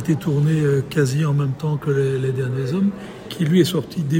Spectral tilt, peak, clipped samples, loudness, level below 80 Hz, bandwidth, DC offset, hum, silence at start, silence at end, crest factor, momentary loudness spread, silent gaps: -7 dB/octave; -4 dBFS; under 0.1%; -20 LUFS; -52 dBFS; 16.5 kHz; under 0.1%; none; 0 s; 0 s; 16 dB; 6 LU; none